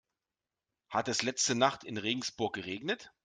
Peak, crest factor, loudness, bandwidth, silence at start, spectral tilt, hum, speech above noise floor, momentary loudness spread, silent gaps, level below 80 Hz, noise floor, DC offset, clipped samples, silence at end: -10 dBFS; 26 dB; -33 LUFS; 11 kHz; 0.9 s; -2.5 dB/octave; none; over 57 dB; 8 LU; none; -74 dBFS; under -90 dBFS; under 0.1%; under 0.1%; 0.15 s